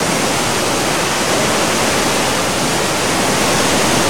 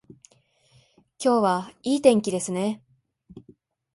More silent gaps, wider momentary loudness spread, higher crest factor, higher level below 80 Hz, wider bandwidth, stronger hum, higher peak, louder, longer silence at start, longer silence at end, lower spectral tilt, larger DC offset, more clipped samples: neither; second, 2 LU vs 9 LU; second, 14 dB vs 22 dB; first, -40 dBFS vs -68 dBFS; first, 19 kHz vs 11.5 kHz; neither; first, 0 dBFS vs -4 dBFS; first, -14 LUFS vs -23 LUFS; second, 0 s vs 1.2 s; second, 0 s vs 0.55 s; second, -2.5 dB/octave vs -5 dB/octave; first, 2% vs under 0.1%; neither